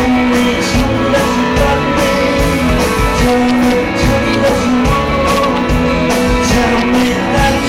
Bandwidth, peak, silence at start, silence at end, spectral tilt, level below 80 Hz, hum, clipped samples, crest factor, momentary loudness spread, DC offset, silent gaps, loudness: 16 kHz; 0 dBFS; 0 s; 0 s; -5 dB/octave; -22 dBFS; none; under 0.1%; 10 dB; 2 LU; under 0.1%; none; -12 LUFS